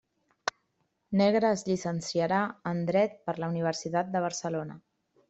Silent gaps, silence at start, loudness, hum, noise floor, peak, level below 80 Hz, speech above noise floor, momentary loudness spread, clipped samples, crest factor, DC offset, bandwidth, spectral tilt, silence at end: none; 0.45 s; -30 LUFS; none; -76 dBFS; -10 dBFS; -70 dBFS; 48 dB; 11 LU; under 0.1%; 20 dB; under 0.1%; 8.2 kHz; -5.5 dB/octave; 0.5 s